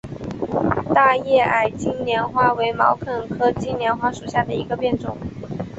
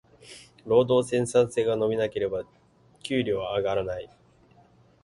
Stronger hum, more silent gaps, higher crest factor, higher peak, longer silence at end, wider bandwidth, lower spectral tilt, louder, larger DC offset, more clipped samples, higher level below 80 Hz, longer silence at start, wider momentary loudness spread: neither; neither; about the same, 18 dB vs 18 dB; first, -2 dBFS vs -8 dBFS; second, 0 s vs 1 s; second, 8 kHz vs 11.5 kHz; about the same, -6 dB/octave vs -5.5 dB/octave; first, -20 LUFS vs -26 LUFS; neither; neither; first, -46 dBFS vs -58 dBFS; second, 0.05 s vs 0.25 s; second, 12 LU vs 23 LU